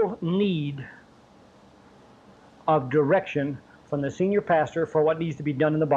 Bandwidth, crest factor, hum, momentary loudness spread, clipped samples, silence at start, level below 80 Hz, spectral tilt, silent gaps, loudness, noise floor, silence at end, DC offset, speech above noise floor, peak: 7.8 kHz; 16 dB; none; 11 LU; under 0.1%; 0 s; -62 dBFS; -8 dB/octave; none; -25 LUFS; -54 dBFS; 0 s; under 0.1%; 30 dB; -10 dBFS